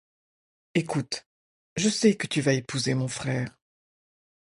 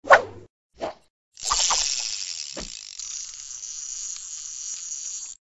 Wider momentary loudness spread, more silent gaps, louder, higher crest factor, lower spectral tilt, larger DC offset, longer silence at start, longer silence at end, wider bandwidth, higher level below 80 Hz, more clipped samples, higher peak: second, 12 LU vs 15 LU; first, 1.26-1.76 s vs 0.50-0.70 s, 1.10-1.32 s; about the same, -27 LUFS vs -26 LUFS; second, 20 dB vs 26 dB; first, -4.5 dB/octave vs 1 dB/octave; neither; first, 0.75 s vs 0.05 s; first, 1.1 s vs 0.05 s; about the same, 11.5 kHz vs 11 kHz; second, -64 dBFS vs -54 dBFS; neither; second, -8 dBFS vs 0 dBFS